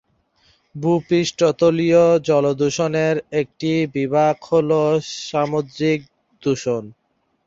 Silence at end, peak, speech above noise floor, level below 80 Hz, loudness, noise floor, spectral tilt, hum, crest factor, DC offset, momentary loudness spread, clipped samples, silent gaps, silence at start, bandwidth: 0.55 s; -4 dBFS; 42 dB; -58 dBFS; -19 LUFS; -60 dBFS; -6 dB/octave; none; 16 dB; under 0.1%; 10 LU; under 0.1%; none; 0.75 s; 7.8 kHz